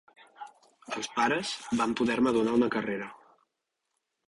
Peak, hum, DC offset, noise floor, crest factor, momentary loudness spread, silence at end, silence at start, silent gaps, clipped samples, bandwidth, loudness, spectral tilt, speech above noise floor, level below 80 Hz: -14 dBFS; none; under 0.1%; -83 dBFS; 18 dB; 22 LU; 1.15 s; 0.4 s; none; under 0.1%; 11.5 kHz; -29 LUFS; -4.5 dB/octave; 55 dB; -66 dBFS